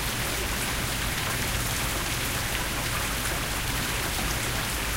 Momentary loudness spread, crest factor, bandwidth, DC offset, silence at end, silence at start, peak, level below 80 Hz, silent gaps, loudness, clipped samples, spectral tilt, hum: 1 LU; 16 dB; 16.5 kHz; 0.1%; 0 s; 0 s; -12 dBFS; -36 dBFS; none; -27 LUFS; under 0.1%; -2.5 dB/octave; none